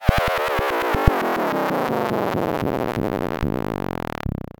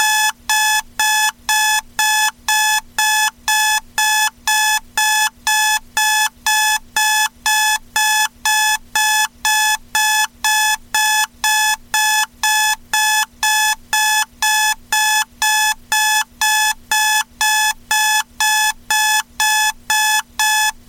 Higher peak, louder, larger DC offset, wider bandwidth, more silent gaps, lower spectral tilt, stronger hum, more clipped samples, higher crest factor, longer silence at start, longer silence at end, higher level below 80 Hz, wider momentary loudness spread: first, 0 dBFS vs -4 dBFS; second, -23 LUFS vs -15 LUFS; neither; first, 19 kHz vs 17 kHz; neither; first, -6.5 dB/octave vs 3.5 dB/octave; neither; neither; first, 22 dB vs 12 dB; about the same, 0 s vs 0 s; about the same, 0.2 s vs 0.15 s; first, -30 dBFS vs -48 dBFS; first, 7 LU vs 2 LU